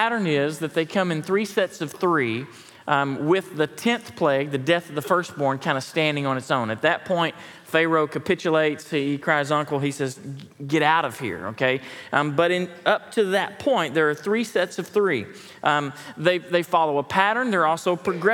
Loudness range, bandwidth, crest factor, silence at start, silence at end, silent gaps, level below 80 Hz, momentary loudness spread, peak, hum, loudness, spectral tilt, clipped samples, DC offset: 1 LU; 18 kHz; 20 dB; 0 s; 0 s; none; -70 dBFS; 6 LU; -2 dBFS; none; -23 LUFS; -5 dB/octave; under 0.1%; under 0.1%